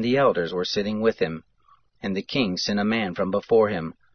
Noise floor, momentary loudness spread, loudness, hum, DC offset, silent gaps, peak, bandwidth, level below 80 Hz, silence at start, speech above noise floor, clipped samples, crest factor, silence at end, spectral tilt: -61 dBFS; 9 LU; -24 LUFS; none; under 0.1%; none; -8 dBFS; 6.6 kHz; -60 dBFS; 0 s; 38 dB; under 0.1%; 16 dB; 0.2 s; -5.5 dB/octave